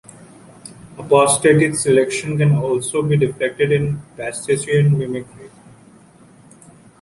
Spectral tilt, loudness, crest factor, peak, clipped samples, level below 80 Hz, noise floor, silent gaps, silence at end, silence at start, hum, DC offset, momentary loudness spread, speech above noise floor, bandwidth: -5.5 dB/octave; -17 LUFS; 16 dB; -2 dBFS; under 0.1%; -52 dBFS; -47 dBFS; none; 1.55 s; 0.65 s; none; under 0.1%; 17 LU; 30 dB; 11.5 kHz